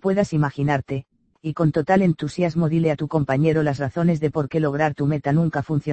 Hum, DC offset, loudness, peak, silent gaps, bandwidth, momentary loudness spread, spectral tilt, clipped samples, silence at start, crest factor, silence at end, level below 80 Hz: none; under 0.1%; -21 LUFS; -4 dBFS; none; 8.6 kHz; 5 LU; -8.5 dB/octave; under 0.1%; 0.05 s; 16 dB; 0 s; -52 dBFS